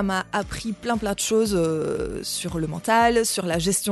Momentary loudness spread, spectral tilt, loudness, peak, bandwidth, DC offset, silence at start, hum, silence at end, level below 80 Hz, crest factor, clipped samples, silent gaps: 9 LU; -4 dB/octave; -23 LUFS; -6 dBFS; 12.5 kHz; under 0.1%; 0 s; none; 0 s; -44 dBFS; 16 dB; under 0.1%; none